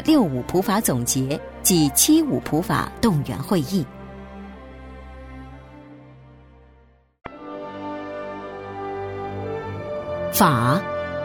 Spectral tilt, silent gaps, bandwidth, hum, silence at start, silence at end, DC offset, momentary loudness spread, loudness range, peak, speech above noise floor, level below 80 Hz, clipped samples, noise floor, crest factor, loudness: -4.5 dB/octave; none; 17 kHz; none; 0 s; 0 s; under 0.1%; 23 LU; 21 LU; -4 dBFS; 35 dB; -46 dBFS; under 0.1%; -55 dBFS; 20 dB; -22 LUFS